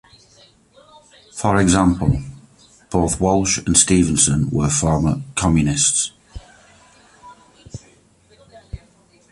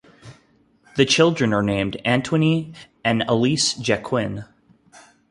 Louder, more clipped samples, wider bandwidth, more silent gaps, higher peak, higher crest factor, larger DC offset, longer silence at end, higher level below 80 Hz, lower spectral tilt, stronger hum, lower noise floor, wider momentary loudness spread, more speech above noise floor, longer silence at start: first, -17 LUFS vs -20 LUFS; neither; about the same, 11.5 kHz vs 11.5 kHz; neither; about the same, 0 dBFS vs -2 dBFS; about the same, 20 dB vs 20 dB; neither; first, 0.55 s vs 0.3 s; first, -36 dBFS vs -52 dBFS; about the same, -4.5 dB/octave vs -4.5 dB/octave; neither; second, -53 dBFS vs -58 dBFS; first, 24 LU vs 11 LU; about the same, 37 dB vs 38 dB; first, 1.35 s vs 0.25 s